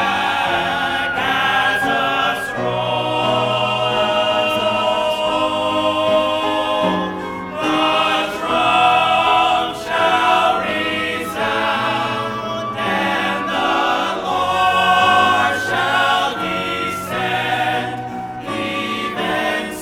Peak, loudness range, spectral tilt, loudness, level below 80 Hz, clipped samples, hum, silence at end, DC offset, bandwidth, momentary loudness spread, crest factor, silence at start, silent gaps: -2 dBFS; 3 LU; -4 dB/octave; -17 LUFS; -50 dBFS; under 0.1%; none; 0 s; under 0.1%; 18 kHz; 8 LU; 16 dB; 0 s; none